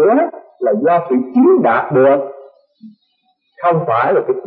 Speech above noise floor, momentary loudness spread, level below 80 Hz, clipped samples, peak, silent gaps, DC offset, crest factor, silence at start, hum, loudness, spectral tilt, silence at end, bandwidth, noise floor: 51 dB; 8 LU; -66 dBFS; under 0.1%; -2 dBFS; none; under 0.1%; 12 dB; 0 s; none; -14 LUFS; -12.5 dB/octave; 0 s; 4.3 kHz; -63 dBFS